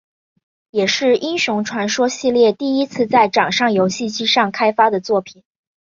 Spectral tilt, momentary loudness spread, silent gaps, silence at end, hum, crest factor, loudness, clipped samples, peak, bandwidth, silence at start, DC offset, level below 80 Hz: -3.5 dB/octave; 5 LU; none; 0.55 s; none; 16 dB; -16 LUFS; under 0.1%; -2 dBFS; 7.6 kHz; 0.75 s; under 0.1%; -62 dBFS